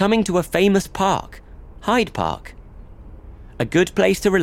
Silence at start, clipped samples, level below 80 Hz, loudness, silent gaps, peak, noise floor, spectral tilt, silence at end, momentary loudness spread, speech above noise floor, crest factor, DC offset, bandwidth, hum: 0 s; under 0.1%; -40 dBFS; -19 LUFS; none; -4 dBFS; -39 dBFS; -5 dB/octave; 0 s; 9 LU; 21 dB; 16 dB; under 0.1%; 16.5 kHz; none